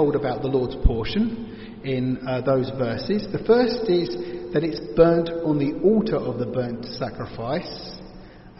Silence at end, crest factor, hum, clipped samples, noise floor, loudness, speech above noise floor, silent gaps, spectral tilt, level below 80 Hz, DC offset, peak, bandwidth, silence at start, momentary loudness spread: 0.05 s; 20 dB; none; under 0.1%; -43 dBFS; -23 LUFS; 21 dB; none; -6 dB/octave; -36 dBFS; under 0.1%; -2 dBFS; 6 kHz; 0 s; 13 LU